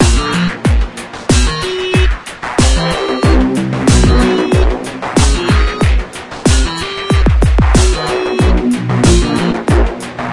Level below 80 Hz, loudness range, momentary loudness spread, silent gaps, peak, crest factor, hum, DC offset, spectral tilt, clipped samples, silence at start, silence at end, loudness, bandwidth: -16 dBFS; 1 LU; 7 LU; none; 0 dBFS; 12 dB; none; under 0.1%; -5 dB/octave; under 0.1%; 0 s; 0 s; -13 LUFS; 11.5 kHz